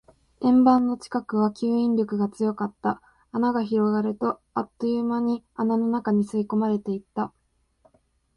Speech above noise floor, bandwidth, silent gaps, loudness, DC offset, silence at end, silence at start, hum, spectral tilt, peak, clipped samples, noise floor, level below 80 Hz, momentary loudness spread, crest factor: 41 dB; 11 kHz; none; -24 LUFS; under 0.1%; 1.1 s; 0.4 s; none; -8 dB/octave; -6 dBFS; under 0.1%; -65 dBFS; -64 dBFS; 10 LU; 18 dB